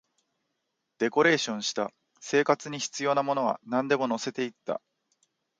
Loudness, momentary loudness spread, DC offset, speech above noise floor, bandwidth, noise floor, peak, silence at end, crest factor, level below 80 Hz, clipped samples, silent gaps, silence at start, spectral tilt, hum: -28 LUFS; 12 LU; under 0.1%; 53 dB; 9.4 kHz; -81 dBFS; -8 dBFS; 0.8 s; 22 dB; -78 dBFS; under 0.1%; none; 1 s; -3.5 dB/octave; none